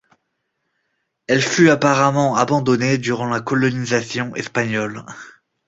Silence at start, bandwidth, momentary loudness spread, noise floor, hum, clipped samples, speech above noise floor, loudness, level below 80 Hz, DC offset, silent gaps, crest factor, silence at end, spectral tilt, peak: 1.3 s; 8 kHz; 13 LU; -73 dBFS; none; under 0.1%; 56 dB; -18 LUFS; -56 dBFS; under 0.1%; none; 18 dB; 0.4 s; -5 dB/octave; -2 dBFS